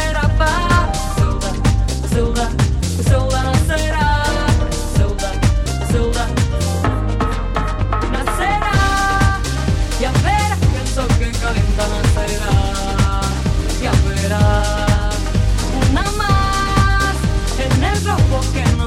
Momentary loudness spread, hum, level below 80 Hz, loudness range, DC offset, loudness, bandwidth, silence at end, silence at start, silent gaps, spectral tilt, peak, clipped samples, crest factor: 4 LU; none; -20 dBFS; 2 LU; under 0.1%; -17 LUFS; 15.5 kHz; 0 s; 0 s; none; -5 dB/octave; 0 dBFS; under 0.1%; 16 dB